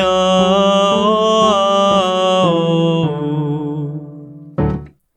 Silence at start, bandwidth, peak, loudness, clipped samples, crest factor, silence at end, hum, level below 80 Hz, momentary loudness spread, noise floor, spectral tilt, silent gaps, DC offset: 0 s; 8.8 kHz; 0 dBFS; -14 LUFS; under 0.1%; 14 dB; 0.3 s; none; -40 dBFS; 13 LU; -34 dBFS; -5.5 dB/octave; none; under 0.1%